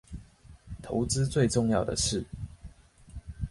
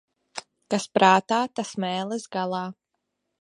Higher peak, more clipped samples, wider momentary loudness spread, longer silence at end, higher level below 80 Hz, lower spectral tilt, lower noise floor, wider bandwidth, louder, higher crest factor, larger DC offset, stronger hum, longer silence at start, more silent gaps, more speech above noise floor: second, -12 dBFS vs -2 dBFS; neither; about the same, 22 LU vs 21 LU; second, 0 s vs 0.7 s; first, -44 dBFS vs -74 dBFS; about the same, -5 dB/octave vs -4.5 dB/octave; second, -53 dBFS vs -80 dBFS; about the same, 11.5 kHz vs 11.5 kHz; second, -28 LUFS vs -24 LUFS; second, 18 dB vs 24 dB; neither; neither; second, 0.1 s vs 0.35 s; neither; second, 25 dB vs 56 dB